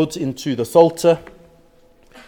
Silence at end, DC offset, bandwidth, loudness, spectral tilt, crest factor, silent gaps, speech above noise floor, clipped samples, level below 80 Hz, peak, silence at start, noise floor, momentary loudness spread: 1.05 s; under 0.1%; 17.5 kHz; -17 LUFS; -6 dB/octave; 18 dB; none; 35 dB; under 0.1%; -54 dBFS; 0 dBFS; 0 s; -51 dBFS; 10 LU